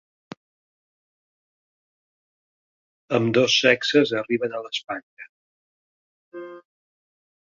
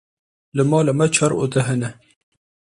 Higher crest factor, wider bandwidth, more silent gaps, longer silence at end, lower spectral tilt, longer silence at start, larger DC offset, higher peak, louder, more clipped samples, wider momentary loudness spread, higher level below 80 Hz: first, 24 dB vs 18 dB; second, 7.6 kHz vs 11.5 kHz; first, 5.03-5.17 s, 5.29-6.32 s vs none; first, 1 s vs 0.7 s; second, -4 dB/octave vs -5.5 dB/octave; first, 3.1 s vs 0.55 s; neither; about the same, -2 dBFS vs -4 dBFS; about the same, -21 LUFS vs -19 LUFS; neither; first, 22 LU vs 9 LU; second, -70 dBFS vs -56 dBFS